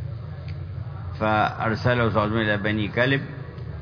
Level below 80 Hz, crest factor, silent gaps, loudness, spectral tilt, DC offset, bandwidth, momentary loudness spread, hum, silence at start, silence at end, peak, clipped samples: -46 dBFS; 18 dB; none; -24 LUFS; -8 dB/octave; under 0.1%; 5.4 kHz; 13 LU; none; 0 s; 0 s; -6 dBFS; under 0.1%